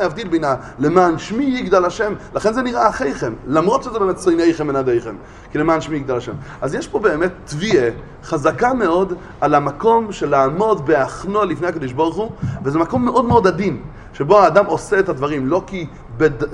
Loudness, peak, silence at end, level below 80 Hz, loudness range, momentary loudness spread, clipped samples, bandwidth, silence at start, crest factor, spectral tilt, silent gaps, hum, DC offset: -17 LUFS; 0 dBFS; 0 s; -40 dBFS; 3 LU; 10 LU; under 0.1%; 11 kHz; 0 s; 18 dB; -6.5 dB/octave; none; none; under 0.1%